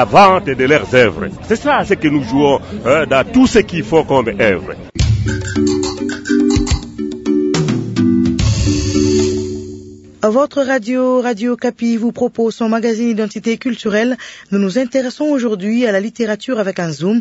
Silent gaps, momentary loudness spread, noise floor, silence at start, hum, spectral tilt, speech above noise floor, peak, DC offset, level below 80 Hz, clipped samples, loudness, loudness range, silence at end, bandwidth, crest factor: none; 7 LU; -34 dBFS; 0 s; none; -5.5 dB/octave; 20 dB; 0 dBFS; under 0.1%; -32 dBFS; under 0.1%; -15 LUFS; 4 LU; 0 s; 8 kHz; 14 dB